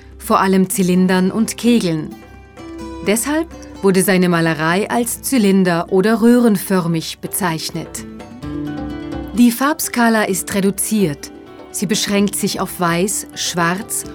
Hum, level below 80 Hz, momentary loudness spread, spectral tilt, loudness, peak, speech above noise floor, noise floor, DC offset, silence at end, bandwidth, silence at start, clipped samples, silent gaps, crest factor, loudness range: none; -44 dBFS; 14 LU; -4.5 dB/octave; -16 LUFS; -2 dBFS; 20 dB; -36 dBFS; under 0.1%; 0 s; 18.5 kHz; 0.05 s; under 0.1%; none; 14 dB; 4 LU